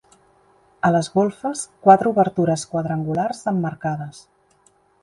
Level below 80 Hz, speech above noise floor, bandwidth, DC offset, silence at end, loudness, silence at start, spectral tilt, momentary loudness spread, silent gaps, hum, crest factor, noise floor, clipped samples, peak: -60 dBFS; 40 dB; 11.5 kHz; under 0.1%; 0.85 s; -20 LUFS; 0.85 s; -6.5 dB/octave; 12 LU; none; none; 20 dB; -59 dBFS; under 0.1%; 0 dBFS